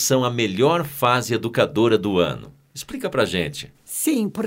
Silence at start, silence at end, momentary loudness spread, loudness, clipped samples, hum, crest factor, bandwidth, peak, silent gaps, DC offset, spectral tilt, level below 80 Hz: 0 s; 0 s; 15 LU; -21 LUFS; under 0.1%; none; 18 dB; 16.5 kHz; -4 dBFS; none; under 0.1%; -4.5 dB/octave; -54 dBFS